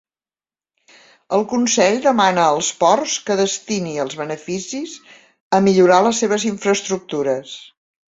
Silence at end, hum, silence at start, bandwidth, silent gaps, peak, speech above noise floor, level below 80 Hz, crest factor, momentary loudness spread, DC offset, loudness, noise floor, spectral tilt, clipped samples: 0.55 s; none; 1.3 s; 8 kHz; 5.40-5.51 s; -2 dBFS; over 73 dB; -62 dBFS; 18 dB; 13 LU; under 0.1%; -17 LUFS; under -90 dBFS; -3.5 dB/octave; under 0.1%